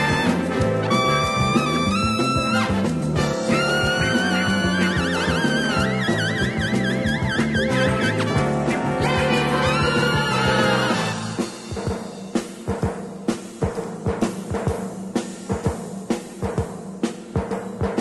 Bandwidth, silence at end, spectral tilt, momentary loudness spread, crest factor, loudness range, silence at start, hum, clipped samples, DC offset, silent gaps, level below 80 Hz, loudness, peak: 12.5 kHz; 0 s; -5 dB/octave; 9 LU; 16 dB; 7 LU; 0 s; none; under 0.1%; under 0.1%; none; -40 dBFS; -22 LUFS; -6 dBFS